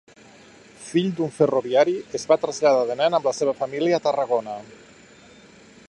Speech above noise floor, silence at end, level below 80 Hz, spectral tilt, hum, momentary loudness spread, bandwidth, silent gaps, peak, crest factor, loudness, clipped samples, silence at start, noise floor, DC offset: 28 dB; 1.2 s; -68 dBFS; -5 dB/octave; none; 6 LU; 11 kHz; none; -4 dBFS; 18 dB; -22 LUFS; under 0.1%; 0.8 s; -49 dBFS; under 0.1%